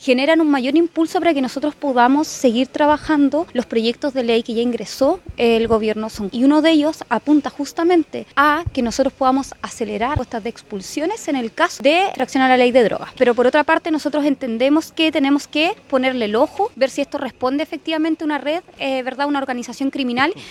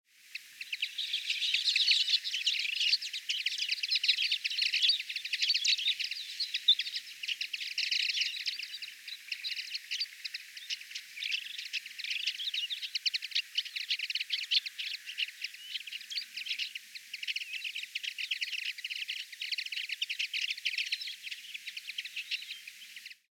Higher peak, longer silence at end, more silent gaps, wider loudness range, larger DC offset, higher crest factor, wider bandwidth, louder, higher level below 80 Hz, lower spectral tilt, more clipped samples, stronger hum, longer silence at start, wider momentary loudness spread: first, 0 dBFS vs -14 dBFS; second, 0 s vs 0.2 s; neither; second, 4 LU vs 8 LU; neither; second, 16 dB vs 22 dB; second, 13.5 kHz vs 16 kHz; first, -18 LUFS vs -32 LUFS; first, -46 dBFS vs under -90 dBFS; first, -4.5 dB/octave vs 6.5 dB/octave; neither; neither; second, 0 s vs 0.25 s; second, 8 LU vs 14 LU